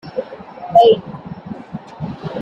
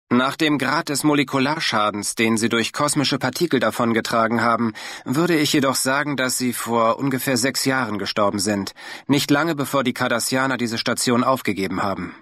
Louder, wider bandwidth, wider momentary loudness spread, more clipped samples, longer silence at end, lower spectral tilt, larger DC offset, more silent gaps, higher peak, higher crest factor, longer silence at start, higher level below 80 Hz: first, -15 LUFS vs -20 LUFS; second, 7.2 kHz vs 15.5 kHz; first, 22 LU vs 5 LU; neither; about the same, 0 s vs 0.05 s; first, -7.5 dB/octave vs -4 dB/octave; neither; neither; first, -2 dBFS vs -6 dBFS; about the same, 16 dB vs 16 dB; about the same, 0.05 s vs 0.1 s; first, -54 dBFS vs -62 dBFS